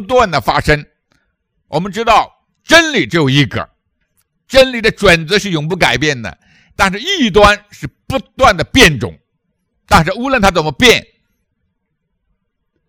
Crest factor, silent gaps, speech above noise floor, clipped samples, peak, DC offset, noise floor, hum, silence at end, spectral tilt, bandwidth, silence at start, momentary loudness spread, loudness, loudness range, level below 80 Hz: 14 dB; none; 57 dB; 1%; 0 dBFS; under 0.1%; -69 dBFS; none; 1.9 s; -4 dB/octave; over 20 kHz; 0 s; 13 LU; -11 LUFS; 2 LU; -32 dBFS